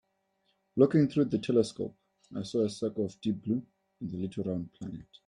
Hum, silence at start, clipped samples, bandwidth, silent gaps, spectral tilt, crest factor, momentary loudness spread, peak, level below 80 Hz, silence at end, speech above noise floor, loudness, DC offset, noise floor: none; 0.75 s; under 0.1%; 11 kHz; none; -7.5 dB/octave; 22 dB; 16 LU; -10 dBFS; -68 dBFS; 0.25 s; 46 dB; -31 LUFS; under 0.1%; -76 dBFS